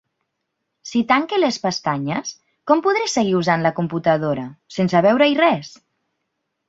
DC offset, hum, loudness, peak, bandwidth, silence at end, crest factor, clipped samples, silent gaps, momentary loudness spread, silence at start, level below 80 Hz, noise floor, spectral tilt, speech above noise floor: under 0.1%; none; -19 LUFS; -2 dBFS; 8 kHz; 1 s; 18 dB; under 0.1%; none; 12 LU; 0.85 s; -62 dBFS; -76 dBFS; -5 dB/octave; 58 dB